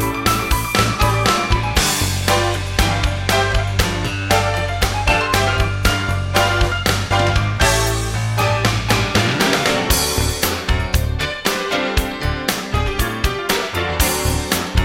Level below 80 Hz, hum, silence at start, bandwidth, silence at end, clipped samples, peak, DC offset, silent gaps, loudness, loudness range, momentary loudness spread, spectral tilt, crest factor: -24 dBFS; none; 0 s; 16.5 kHz; 0 s; under 0.1%; -4 dBFS; under 0.1%; none; -17 LUFS; 3 LU; 5 LU; -4 dB/octave; 14 dB